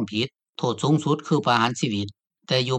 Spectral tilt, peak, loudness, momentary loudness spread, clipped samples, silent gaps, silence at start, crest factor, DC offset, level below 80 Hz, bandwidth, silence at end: -5.5 dB/octave; -6 dBFS; -24 LUFS; 9 LU; under 0.1%; 0.49-0.53 s; 0 s; 18 dB; under 0.1%; -66 dBFS; 9.4 kHz; 0 s